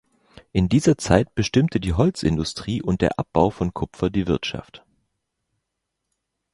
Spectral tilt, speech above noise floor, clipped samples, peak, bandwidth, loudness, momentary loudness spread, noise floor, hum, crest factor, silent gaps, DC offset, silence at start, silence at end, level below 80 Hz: -6.5 dB/octave; 59 dB; under 0.1%; -2 dBFS; 11.5 kHz; -22 LUFS; 8 LU; -80 dBFS; none; 22 dB; none; under 0.1%; 0.55 s; 1.75 s; -38 dBFS